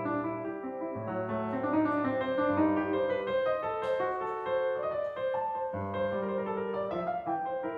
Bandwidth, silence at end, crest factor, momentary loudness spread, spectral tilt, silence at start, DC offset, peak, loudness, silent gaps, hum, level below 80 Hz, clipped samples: 5 kHz; 0 s; 16 dB; 7 LU; -8.5 dB/octave; 0 s; under 0.1%; -16 dBFS; -32 LUFS; none; none; -68 dBFS; under 0.1%